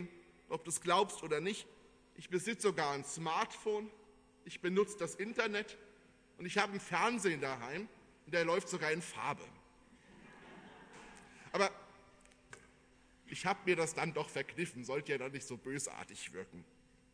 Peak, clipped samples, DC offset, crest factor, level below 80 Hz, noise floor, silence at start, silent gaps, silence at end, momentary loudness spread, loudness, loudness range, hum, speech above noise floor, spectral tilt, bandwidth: -16 dBFS; under 0.1%; under 0.1%; 24 dB; -74 dBFS; -66 dBFS; 0 s; none; 0.5 s; 22 LU; -38 LUFS; 6 LU; none; 28 dB; -3.5 dB/octave; 11 kHz